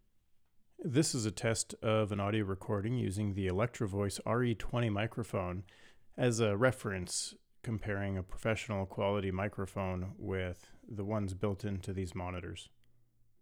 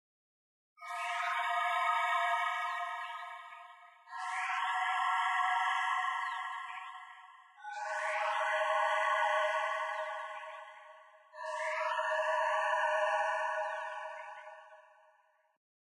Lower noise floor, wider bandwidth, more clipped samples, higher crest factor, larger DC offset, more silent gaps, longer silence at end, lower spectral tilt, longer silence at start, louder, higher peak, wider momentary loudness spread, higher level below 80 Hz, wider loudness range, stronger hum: about the same, -67 dBFS vs -69 dBFS; first, 16.5 kHz vs 12.5 kHz; neither; about the same, 20 dB vs 16 dB; neither; neither; second, 0.75 s vs 1.2 s; first, -5.5 dB/octave vs 3.5 dB/octave; about the same, 0.8 s vs 0.8 s; about the same, -36 LUFS vs -34 LUFS; first, -14 dBFS vs -18 dBFS; second, 10 LU vs 19 LU; first, -58 dBFS vs under -90 dBFS; about the same, 4 LU vs 2 LU; neither